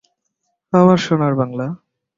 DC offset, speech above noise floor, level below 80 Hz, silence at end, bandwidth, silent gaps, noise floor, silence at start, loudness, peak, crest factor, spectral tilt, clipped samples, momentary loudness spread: under 0.1%; 58 dB; -56 dBFS; 0.4 s; 7.6 kHz; none; -72 dBFS; 0.75 s; -16 LUFS; -2 dBFS; 16 dB; -7.5 dB/octave; under 0.1%; 14 LU